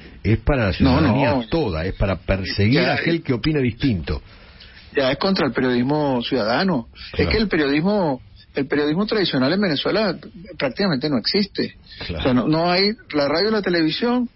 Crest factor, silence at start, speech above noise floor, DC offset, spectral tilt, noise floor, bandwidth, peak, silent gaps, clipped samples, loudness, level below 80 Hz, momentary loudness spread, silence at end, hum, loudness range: 16 dB; 0 s; 23 dB; under 0.1%; -10 dB/octave; -43 dBFS; 5.8 kHz; -4 dBFS; none; under 0.1%; -20 LUFS; -36 dBFS; 9 LU; 0.1 s; none; 2 LU